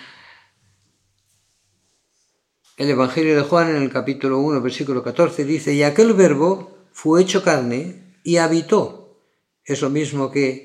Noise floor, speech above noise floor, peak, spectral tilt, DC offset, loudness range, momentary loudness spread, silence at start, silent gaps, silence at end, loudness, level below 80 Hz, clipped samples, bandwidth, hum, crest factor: -68 dBFS; 50 dB; 0 dBFS; -5.5 dB/octave; under 0.1%; 5 LU; 11 LU; 0 s; none; 0 s; -18 LUFS; -76 dBFS; under 0.1%; 12.5 kHz; none; 18 dB